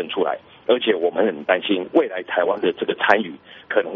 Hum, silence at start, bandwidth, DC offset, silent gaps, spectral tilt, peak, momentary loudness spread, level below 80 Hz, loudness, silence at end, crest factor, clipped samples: none; 0 s; 6.8 kHz; under 0.1%; none; -1.5 dB/octave; 0 dBFS; 6 LU; -68 dBFS; -21 LUFS; 0 s; 20 dB; under 0.1%